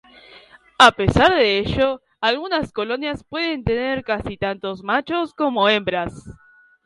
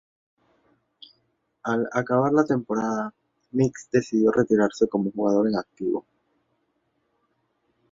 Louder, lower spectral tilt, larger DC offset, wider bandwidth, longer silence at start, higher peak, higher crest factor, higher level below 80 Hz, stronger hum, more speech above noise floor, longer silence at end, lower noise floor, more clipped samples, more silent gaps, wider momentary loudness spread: first, -19 LUFS vs -24 LUFS; second, -5 dB/octave vs -7 dB/octave; neither; first, 11.5 kHz vs 7.8 kHz; second, 0.35 s vs 1.65 s; first, 0 dBFS vs -6 dBFS; about the same, 20 dB vs 20 dB; first, -40 dBFS vs -64 dBFS; neither; second, 28 dB vs 49 dB; second, 0.55 s vs 1.9 s; second, -48 dBFS vs -72 dBFS; neither; neither; first, 12 LU vs 9 LU